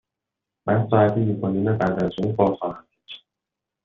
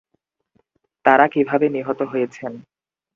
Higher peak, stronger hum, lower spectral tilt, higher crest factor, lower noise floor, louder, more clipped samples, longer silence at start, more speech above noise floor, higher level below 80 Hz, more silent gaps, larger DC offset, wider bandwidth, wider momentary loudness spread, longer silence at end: second, -4 dBFS vs 0 dBFS; neither; about the same, -7.5 dB/octave vs -7 dB/octave; about the same, 18 dB vs 20 dB; first, -85 dBFS vs -72 dBFS; second, -22 LUFS vs -19 LUFS; neither; second, 0.65 s vs 1.05 s; first, 64 dB vs 54 dB; first, -56 dBFS vs -68 dBFS; neither; neither; second, 6.6 kHz vs 7.4 kHz; first, 22 LU vs 14 LU; about the same, 0.65 s vs 0.55 s